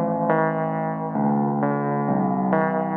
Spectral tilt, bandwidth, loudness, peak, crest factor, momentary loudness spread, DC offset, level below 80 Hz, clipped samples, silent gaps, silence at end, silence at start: -12 dB/octave; 3.4 kHz; -22 LUFS; -6 dBFS; 16 dB; 4 LU; under 0.1%; -64 dBFS; under 0.1%; none; 0 s; 0 s